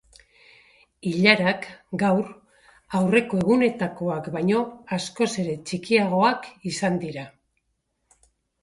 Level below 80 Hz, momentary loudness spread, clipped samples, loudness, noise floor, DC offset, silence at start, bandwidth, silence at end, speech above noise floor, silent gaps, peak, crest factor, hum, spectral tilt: -62 dBFS; 12 LU; under 0.1%; -23 LUFS; -75 dBFS; under 0.1%; 1.05 s; 11.5 kHz; 1.35 s; 52 dB; none; -2 dBFS; 22 dB; none; -5.5 dB/octave